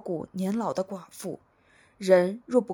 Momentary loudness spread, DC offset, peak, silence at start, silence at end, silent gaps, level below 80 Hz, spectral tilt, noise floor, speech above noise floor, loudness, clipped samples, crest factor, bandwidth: 16 LU; under 0.1%; -6 dBFS; 0.05 s; 0 s; none; -72 dBFS; -6.5 dB/octave; -61 dBFS; 35 dB; -27 LUFS; under 0.1%; 20 dB; 19 kHz